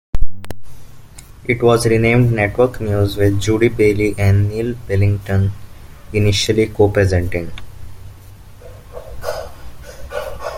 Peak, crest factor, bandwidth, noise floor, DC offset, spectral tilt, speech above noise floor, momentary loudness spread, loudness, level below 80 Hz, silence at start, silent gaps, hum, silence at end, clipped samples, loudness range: 0 dBFS; 16 dB; 15.5 kHz; -38 dBFS; under 0.1%; -6 dB/octave; 23 dB; 22 LU; -16 LUFS; -32 dBFS; 0.15 s; none; none; 0 s; 0.1%; 6 LU